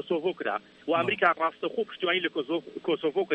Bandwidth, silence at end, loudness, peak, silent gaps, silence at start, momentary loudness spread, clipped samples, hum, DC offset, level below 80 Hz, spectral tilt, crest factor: 8.2 kHz; 0 s; -28 LUFS; -8 dBFS; none; 0 s; 8 LU; under 0.1%; none; under 0.1%; -76 dBFS; -6.5 dB/octave; 20 dB